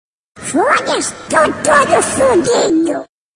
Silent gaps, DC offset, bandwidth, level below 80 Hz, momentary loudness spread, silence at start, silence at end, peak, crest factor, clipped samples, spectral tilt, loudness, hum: none; under 0.1%; 11 kHz; -48 dBFS; 8 LU; 0.35 s; 0.3 s; 0 dBFS; 14 dB; under 0.1%; -3 dB/octave; -13 LUFS; none